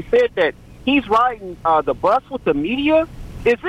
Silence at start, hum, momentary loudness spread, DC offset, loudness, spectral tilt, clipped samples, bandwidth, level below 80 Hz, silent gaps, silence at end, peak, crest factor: 0 s; none; 6 LU; under 0.1%; -18 LUFS; -6 dB/octave; under 0.1%; 10.5 kHz; -40 dBFS; none; 0 s; -6 dBFS; 12 dB